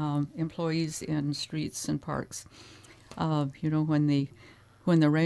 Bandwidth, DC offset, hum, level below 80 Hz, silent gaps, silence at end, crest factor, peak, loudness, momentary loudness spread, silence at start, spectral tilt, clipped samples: 11 kHz; under 0.1%; none; -62 dBFS; none; 0 s; 18 dB; -10 dBFS; -30 LUFS; 15 LU; 0 s; -6 dB/octave; under 0.1%